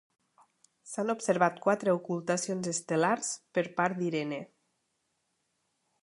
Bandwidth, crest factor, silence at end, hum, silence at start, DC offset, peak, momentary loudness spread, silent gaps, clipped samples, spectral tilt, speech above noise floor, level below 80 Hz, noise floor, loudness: 11.5 kHz; 22 dB; 1.6 s; none; 0.85 s; under 0.1%; -10 dBFS; 8 LU; none; under 0.1%; -4.5 dB/octave; 49 dB; -80 dBFS; -79 dBFS; -30 LUFS